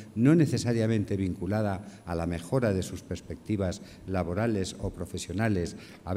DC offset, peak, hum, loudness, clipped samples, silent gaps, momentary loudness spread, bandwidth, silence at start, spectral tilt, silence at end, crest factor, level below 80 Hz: under 0.1%; -10 dBFS; none; -29 LUFS; under 0.1%; none; 13 LU; 15 kHz; 0 s; -6.5 dB/octave; 0 s; 18 dB; -50 dBFS